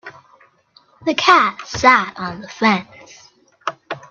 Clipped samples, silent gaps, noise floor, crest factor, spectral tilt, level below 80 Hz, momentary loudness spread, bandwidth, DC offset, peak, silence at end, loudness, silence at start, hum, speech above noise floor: under 0.1%; none; -54 dBFS; 20 dB; -3.5 dB/octave; -54 dBFS; 16 LU; 7.8 kHz; under 0.1%; 0 dBFS; 0.1 s; -16 LUFS; 0.05 s; none; 38 dB